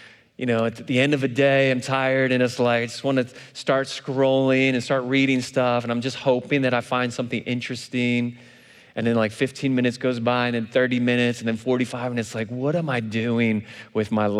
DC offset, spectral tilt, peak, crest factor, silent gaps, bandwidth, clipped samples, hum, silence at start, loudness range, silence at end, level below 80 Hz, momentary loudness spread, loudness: under 0.1%; -6 dB/octave; -6 dBFS; 16 dB; none; 12.5 kHz; under 0.1%; none; 0 s; 3 LU; 0 s; -70 dBFS; 8 LU; -22 LUFS